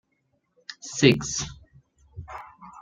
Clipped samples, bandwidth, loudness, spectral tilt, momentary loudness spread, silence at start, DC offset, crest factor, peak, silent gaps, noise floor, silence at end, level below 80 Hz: under 0.1%; 13.5 kHz; -23 LUFS; -4 dB/octave; 25 LU; 0.7 s; under 0.1%; 26 dB; -2 dBFS; none; -72 dBFS; 0 s; -54 dBFS